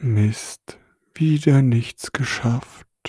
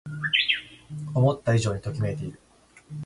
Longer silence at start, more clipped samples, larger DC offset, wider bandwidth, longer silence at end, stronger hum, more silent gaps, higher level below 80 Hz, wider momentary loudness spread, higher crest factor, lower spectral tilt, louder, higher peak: about the same, 0 s vs 0.05 s; neither; neither; about the same, 11 kHz vs 11.5 kHz; about the same, 0 s vs 0 s; neither; neither; about the same, -54 dBFS vs -52 dBFS; second, 14 LU vs 17 LU; about the same, 18 dB vs 20 dB; first, -6.5 dB/octave vs -5 dB/octave; first, -20 LUFS vs -25 LUFS; first, -4 dBFS vs -8 dBFS